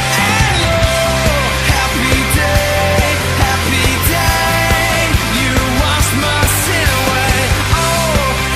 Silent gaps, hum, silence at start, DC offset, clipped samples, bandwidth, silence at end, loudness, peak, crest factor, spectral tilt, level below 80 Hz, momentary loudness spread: none; none; 0 s; under 0.1%; under 0.1%; 15.5 kHz; 0 s; -12 LUFS; 0 dBFS; 12 dB; -3.5 dB/octave; -20 dBFS; 1 LU